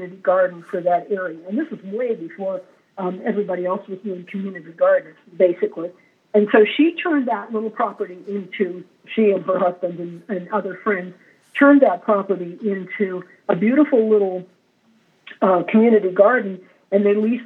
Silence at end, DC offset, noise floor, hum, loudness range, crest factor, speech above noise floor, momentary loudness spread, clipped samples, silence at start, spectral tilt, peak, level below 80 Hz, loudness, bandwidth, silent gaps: 0 s; under 0.1%; -59 dBFS; none; 6 LU; 18 dB; 40 dB; 15 LU; under 0.1%; 0 s; -8.5 dB/octave; -2 dBFS; under -90 dBFS; -20 LUFS; 4.1 kHz; none